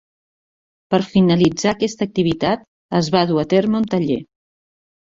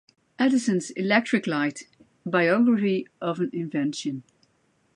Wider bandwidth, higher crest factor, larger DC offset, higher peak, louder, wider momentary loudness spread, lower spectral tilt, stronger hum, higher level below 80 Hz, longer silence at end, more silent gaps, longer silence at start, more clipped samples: second, 7.8 kHz vs 11 kHz; about the same, 18 dB vs 20 dB; neither; first, 0 dBFS vs -6 dBFS; first, -18 LUFS vs -24 LUFS; second, 7 LU vs 12 LU; about the same, -6 dB/octave vs -5.5 dB/octave; neither; first, -52 dBFS vs -76 dBFS; about the same, 0.8 s vs 0.75 s; first, 2.68-2.89 s vs none; first, 0.9 s vs 0.4 s; neither